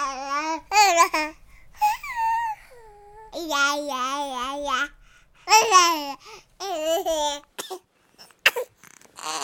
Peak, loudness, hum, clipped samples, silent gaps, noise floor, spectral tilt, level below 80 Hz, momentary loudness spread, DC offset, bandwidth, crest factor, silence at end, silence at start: -2 dBFS; -22 LUFS; none; under 0.1%; none; -54 dBFS; 0.5 dB/octave; -56 dBFS; 19 LU; under 0.1%; 17 kHz; 22 dB; 0 s; 0 s